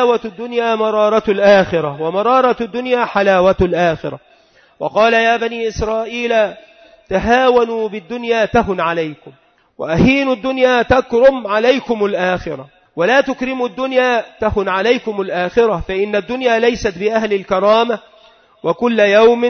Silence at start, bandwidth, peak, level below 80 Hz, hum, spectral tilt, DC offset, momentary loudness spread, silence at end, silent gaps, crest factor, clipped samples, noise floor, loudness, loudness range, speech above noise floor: 0 s; 6.6 kHz; -2 dBFS; -38 dBFS; none; -5.5 dB/octave; under 0.1%; 10 LU; 0 s; none; 14 dB; under 0.1%; -50 dBFS; -15 LUFS; 3 LU; 36 dB